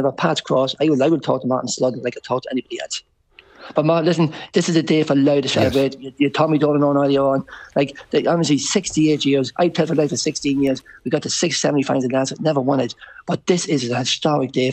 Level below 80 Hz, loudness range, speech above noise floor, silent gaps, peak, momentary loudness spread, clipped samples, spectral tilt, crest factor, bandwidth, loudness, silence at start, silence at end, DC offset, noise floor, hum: -54 dBFS; 4 LU; 32 dB; none; -2 dBFS; 8 LU; under 0.1%; -5 dB/octave; 16 dB; 9.2 kHz; -19 LUFS; 0 s; 0 s; under 0.1%; -50 dBFS; none